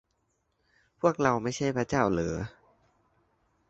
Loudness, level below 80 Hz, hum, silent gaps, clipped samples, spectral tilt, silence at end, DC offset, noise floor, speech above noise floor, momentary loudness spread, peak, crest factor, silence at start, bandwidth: -28 LUFS; -54 dBFS; none; none; under 0.1%; -6 dB/octave; 1.2 s; under 0.1%; -75 dBFS; 48 dB; 9 LU; -8 dBFS; 24 dB; 1.05 s; 8.2 kHz